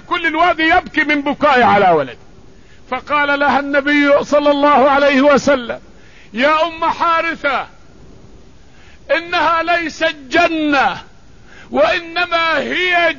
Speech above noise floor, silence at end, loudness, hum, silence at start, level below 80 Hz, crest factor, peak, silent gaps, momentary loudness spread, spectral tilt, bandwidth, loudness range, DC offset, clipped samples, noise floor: 30 dB; 0 s; -14 LUFS; none; 0.1 s; -46 dBFS; 14 dB; -2 dBFS; none; 8 LU; -4.5 dB/octave; 7.4 kHz; 5 LU; 0.8%; under 0.1%; -44 dBFS